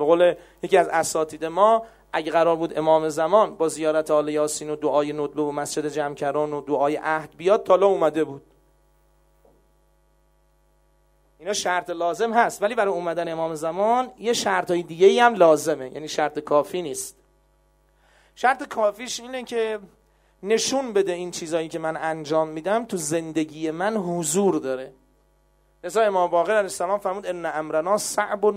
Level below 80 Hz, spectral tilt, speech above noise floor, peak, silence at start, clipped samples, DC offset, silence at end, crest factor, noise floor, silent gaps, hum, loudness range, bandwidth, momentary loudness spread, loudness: -62 dBFS; -4 dB/octave; 40 dB; -2 dBFS; 0 s; under 0.1%; under 0.1%; 0 s; 20 dB; -62 dBFS; none; none; 6 LU; 16 kHz; 10 LU; -23 LUFS